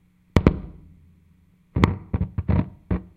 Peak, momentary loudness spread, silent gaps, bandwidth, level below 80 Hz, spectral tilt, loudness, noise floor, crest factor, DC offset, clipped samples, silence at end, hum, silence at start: 0 dBFS; 11 LU; none; 10 kHz; -32 dBFS; -8.5 dB/octave; -24 LUFS; -58 dBFS; 24 dB; under 0.1%; under 0.1%; 0.15 s; none; 0.35 s